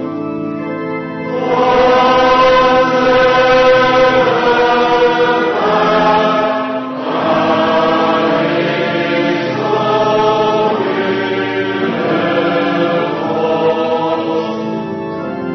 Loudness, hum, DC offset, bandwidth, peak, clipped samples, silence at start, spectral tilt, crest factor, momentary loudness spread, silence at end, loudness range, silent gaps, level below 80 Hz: -13 LUFS; none; under 0.1%; 6.4 kHz; -2 dBFS; under 0.1%; 0 s; -6 dB/octave; 12 dB; 11 LU; 0 s; 5 LU; none; -44 dBFS